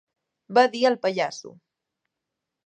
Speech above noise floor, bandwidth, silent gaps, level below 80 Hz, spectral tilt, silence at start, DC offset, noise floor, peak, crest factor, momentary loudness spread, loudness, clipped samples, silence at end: 62 dB; 9 kHz; none; -80 dBFS; -4 dB/octave; 0.5 s; under 0.1%; -84 dBFS; -6 dBFS; 20 dB; 10 LU; -22 LUFS; under 0.1%; 1.15 s